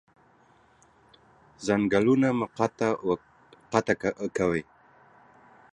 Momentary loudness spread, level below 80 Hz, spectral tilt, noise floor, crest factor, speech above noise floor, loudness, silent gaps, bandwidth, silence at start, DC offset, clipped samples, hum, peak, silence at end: 8 LU; -60 dBFS; -6.5 dB/octave; -60 dBFS; 24 dB; 35 dB; -27 LUFS; none; 10 kHz; 1.6 s; under 0.1%; under 0.1%; none; -6 dBFS; 1.1 s